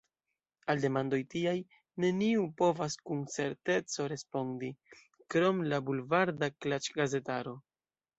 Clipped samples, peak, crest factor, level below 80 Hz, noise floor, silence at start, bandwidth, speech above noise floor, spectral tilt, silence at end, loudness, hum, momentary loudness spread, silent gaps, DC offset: under 0.1%; -14 dBFS; 20 dB; -74 dBFS; under -90 dBFS; 0.65 s; 8.2 kHz; over 57 dB; -5.5 dB/octave; 0.6 s; -33 LUFS; none; 9 LU; none; under 0.1%